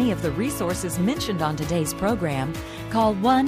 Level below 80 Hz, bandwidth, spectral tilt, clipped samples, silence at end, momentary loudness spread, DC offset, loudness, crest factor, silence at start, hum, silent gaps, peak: -42 dBFS; 15.5 kHz; -5.5 dB/octave; under 0.1%; 0 s; 6 LU; under 0.1%; -24 LUFS; 14 dB; 0 s; none; none; -8 dBFS